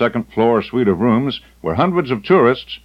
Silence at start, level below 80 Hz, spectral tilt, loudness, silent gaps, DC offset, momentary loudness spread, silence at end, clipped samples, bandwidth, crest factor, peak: 0 s; -48 dBFS; -8.5 dB/octave; -16 LUFS; none; under 0.1%; 8 LU; 0.1 s; under 0.1%; 6 kHz; 14 dB; -2 dBFS